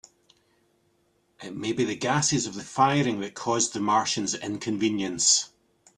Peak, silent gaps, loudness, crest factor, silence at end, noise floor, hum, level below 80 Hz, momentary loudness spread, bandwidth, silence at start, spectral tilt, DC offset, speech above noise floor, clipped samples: -6 dBFS; none; -25 LUFS; 22 dB; 0.5 s; -68 dBFS; none; -64 dBFS; 11 LU; 12 kHz; 1.4 s; -3 dB/octave; under 0.1%; 43 dB; under 0.1%